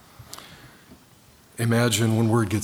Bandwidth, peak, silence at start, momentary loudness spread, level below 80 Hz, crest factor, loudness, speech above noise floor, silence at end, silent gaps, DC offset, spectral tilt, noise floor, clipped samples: 16.5 kHz; -8 dBFS; 0.2 s; 22 LU; -60 dBFS; 18 dB; -22 LUFS; 33 dB; 0 s; none; under 0.1%; -5 dB/octave; -54 dBFS; under 0.1%